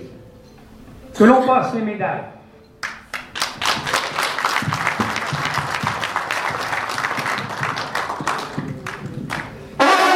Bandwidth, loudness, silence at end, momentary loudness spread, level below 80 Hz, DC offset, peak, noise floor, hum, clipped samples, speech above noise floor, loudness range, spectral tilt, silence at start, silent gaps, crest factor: 16 kHz; -20 LUFS; 0 s; 15 LU; -52 dBFS; under 0.1%; 0 dBFS; -43 dBFS; none; under 0.1%; 28 dB; 4 LU; -4 dB/octave; 0 s; none; 20 dB